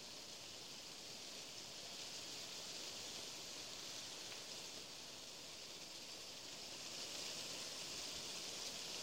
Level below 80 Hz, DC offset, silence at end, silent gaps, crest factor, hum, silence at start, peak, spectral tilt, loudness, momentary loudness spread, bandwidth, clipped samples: -80 dBFS; under 0.1%; 0 s; none; 18 dB; none; 0 s; -34 dBFS; -0.5 dB/octave; -48 LUFS; 5 LU; 16 kHz; under 0.1%